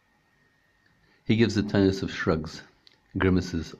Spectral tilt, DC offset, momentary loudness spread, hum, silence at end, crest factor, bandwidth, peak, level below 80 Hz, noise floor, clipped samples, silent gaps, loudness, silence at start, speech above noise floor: -6.5 dB/octave; under 0.1%; 16 LU; none; 0.05 s; 20 dB; 8.6 kHz; -8 dBFS; -52 dBFS; -66 dBFS; under 0.1%; none; -26 LUFS; 1.3 s; 41 dB